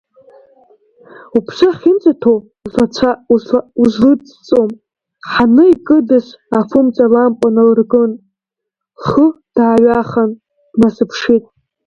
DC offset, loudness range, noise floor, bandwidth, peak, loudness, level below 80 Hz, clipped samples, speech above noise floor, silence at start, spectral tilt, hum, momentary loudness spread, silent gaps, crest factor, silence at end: under 0.1%; 3 LU; -80 dBFS; 7 kHz; 0 dBFS; -12 LUFS; -48 dBFS; under 0.1%; 69 dB; 1.35 s; -7 dB/octave; none; 8 LU; none; 12 dB; 0.45 s